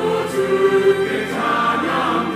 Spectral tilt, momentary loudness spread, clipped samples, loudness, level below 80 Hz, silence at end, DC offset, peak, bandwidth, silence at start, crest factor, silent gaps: -5 dB/octave; 5 LU; under 0.1%; -18 LUFS; -62 dBFS; 0 s; under 0.1%; -4 dBFS; 15 kHz; 0 s; 14 dB; none